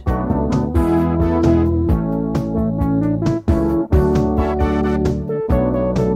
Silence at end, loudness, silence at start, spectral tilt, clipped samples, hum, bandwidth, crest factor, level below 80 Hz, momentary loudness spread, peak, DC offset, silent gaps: 0 s; -18 LUFS; 0 s; -9 dB/octave; under 0.1%; none; 13.5 kHz; 14 dB; -24 dBFS; 4 LU; -2 dBFS; under 0.1%; none